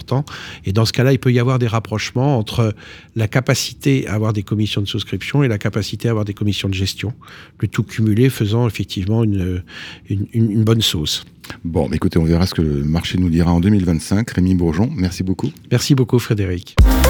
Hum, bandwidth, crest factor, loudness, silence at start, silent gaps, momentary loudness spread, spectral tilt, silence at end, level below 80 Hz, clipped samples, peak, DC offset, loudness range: none; 20 kHz; 16 dB; -18 LUFS; 0 s; none; 8 LU; -6 dB/octave; 0 s; -28 dBFS; under 0.1%; -2 dBFS; under 0.1%; 3 LU